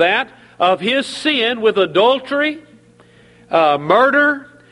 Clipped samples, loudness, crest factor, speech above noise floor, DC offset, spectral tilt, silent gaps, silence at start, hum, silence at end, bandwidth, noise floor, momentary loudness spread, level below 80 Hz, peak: under 0.1%; -15 LUFS; 16 dB; 32 dB; under 0.1%; -4 dB/octave; none; 0 s; none; 0.3 s; 11.5 kHz; -48 dBFS; 7 LU; -62 dBFS; 0 dBFS